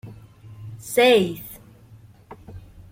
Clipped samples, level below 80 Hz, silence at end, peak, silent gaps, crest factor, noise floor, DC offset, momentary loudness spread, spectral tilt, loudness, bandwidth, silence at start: under 0.1%; -54 dBFS; 0.35 s; -6 dBFS; none; 18 dB; -48 dBFS; under 0.1%; 27 LU; -4 dB/octave; -19 LUFS; 16.5 kHz; 0.05 s